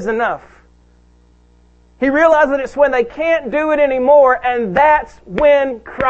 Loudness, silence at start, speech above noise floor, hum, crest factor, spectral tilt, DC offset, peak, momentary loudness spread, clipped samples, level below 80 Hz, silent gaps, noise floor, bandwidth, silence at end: -14 LUFS; 0 s; 36 dB; 60 Hz at -50 dBFS; 14 dB; -6 dB/octave; under 0.1%; 0 dBFS; 9 LU; under 0.1%; -42 dBFS; none; -49 dBFS; 7.8 kHz; 0 s